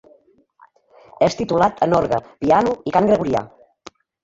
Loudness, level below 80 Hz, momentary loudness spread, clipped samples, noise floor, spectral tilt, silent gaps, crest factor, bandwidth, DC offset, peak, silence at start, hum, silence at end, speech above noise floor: -18 LUFS; -50 dBFS; 6 LU; under 0.1%; -55 dBFS; -6.5 dB/octave; none; 18 dB; 7.8 kHz; under 0.1%; -2 dBFS; 1.2 s; none; 0.75 s; 37 dB